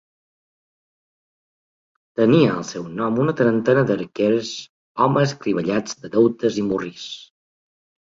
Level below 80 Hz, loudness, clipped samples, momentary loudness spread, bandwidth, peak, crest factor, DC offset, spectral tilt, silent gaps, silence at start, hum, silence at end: -60 dBFS; -20 LUFS; under 0.1%; 15 LU; 7.8 kHz; -4 dBFS; 18 dB; under 0.1%; -6.5 dB/octave; 4.69-4.95 s; 2.2 s; none; 0.85 s